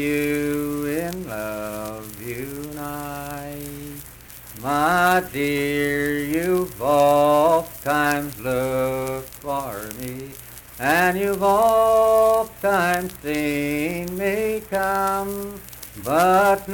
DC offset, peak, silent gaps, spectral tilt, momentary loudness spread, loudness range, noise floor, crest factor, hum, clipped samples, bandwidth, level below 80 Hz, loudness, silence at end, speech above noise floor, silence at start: under 0.1%; -4 dBFS; none; -5 dB/octave; 17 LU; 9 LU; -41 dBFS; 16 dB; none; under 0.1%; 19 kHz; -48 dBFS; -21 LUFS; 0 s; 20 dB; 0 s